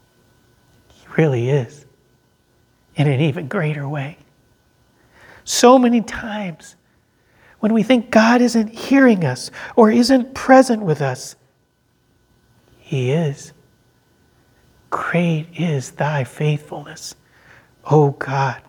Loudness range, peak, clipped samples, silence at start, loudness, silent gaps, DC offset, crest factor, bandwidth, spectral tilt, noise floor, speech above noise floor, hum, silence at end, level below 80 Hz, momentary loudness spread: 9 LU; 0 dBFS; under 0.1%; 1.1 s; -17 LUFS; none; under 0.1%; 18 dB; 18.5 kHz; -6 dB/octave; -62 dBFS; 46 dB; none; 0.1 s; -56 dBFS; 18 LU